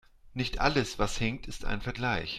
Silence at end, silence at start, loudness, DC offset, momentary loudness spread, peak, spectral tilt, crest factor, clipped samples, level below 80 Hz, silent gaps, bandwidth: 0 s; 0.25 s; -31 LUFS; under 0.1%; 10 LU; -8 dBFS; -4.5 dB/octave; 22 dB; under 0.1%; -40 dBFS; none; 13.5 kHz